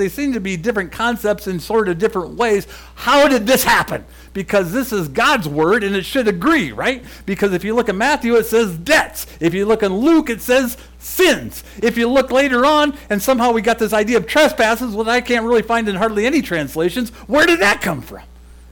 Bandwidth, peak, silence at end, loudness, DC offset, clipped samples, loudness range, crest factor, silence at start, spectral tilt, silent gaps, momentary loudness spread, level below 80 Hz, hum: 19 kHz; -6 dBFS; 0 s; -16 LUFS; under 0.1%; under 0.1%; 2 LU; 10 dB; 0 s; -4 dB/octave; none; 8 LU; -40 dBFS; none